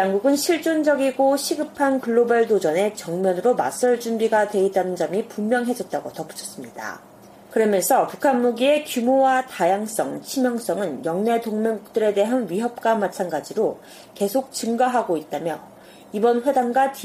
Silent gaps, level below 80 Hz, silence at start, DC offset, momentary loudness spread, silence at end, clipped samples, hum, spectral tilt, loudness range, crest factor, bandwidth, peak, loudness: none; -68 dBFS; 0 s; under 0.1%; 9 LU; 0 s; under 0.1%; none; -4.5 dB/octave; 4 LU; 16 dB; 15.5 kHz; -6 dBFS; -21 LUFS